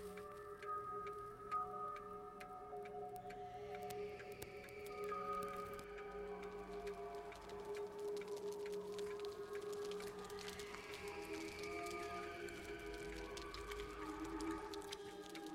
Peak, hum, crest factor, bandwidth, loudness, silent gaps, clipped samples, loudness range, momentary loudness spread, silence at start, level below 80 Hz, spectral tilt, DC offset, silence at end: -26 dBFS; none; 24 dB; 16.5 kHz; -49 LUFS; none; under 0.1%; 1 LU; 6 LU; 0 s; -66 dBFS; -4 dB/octave; under 0.1%; 0 s